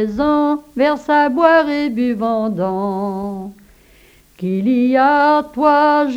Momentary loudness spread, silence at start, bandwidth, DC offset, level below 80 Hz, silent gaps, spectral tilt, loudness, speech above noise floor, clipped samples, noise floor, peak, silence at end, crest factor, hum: 11 LU; 0 s; 15 kHz; under 0.1%; -48 dBFS; none; -7 dB/octave; -15 LUFS; 33 dB; under 0.1%; -48 dBFS; 0 dBFS; 0 s; 16 dB; none